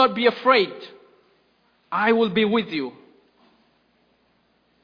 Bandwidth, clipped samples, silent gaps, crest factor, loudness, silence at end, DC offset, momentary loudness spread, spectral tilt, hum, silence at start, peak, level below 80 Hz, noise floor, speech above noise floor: 5.2 kHz; under 0.1%; none; 22 dB; -21 LUFS; 1.95 s; under 0.1%; 15 LU; -7 dB/octave; none; 0 s; -2 dBFS; -68 dBFS; -64 dBFS; 44 dB